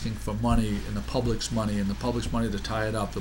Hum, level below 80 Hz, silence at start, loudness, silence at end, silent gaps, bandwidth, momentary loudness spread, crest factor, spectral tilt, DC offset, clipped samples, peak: none; -34 dBFS; 0 s; -29 LUFS; 0 s; none; 16.5 kHz; 4 LU; 18 dB; -5.5 dB/octave; under 0.1%; under 0.1%; -10 dBFS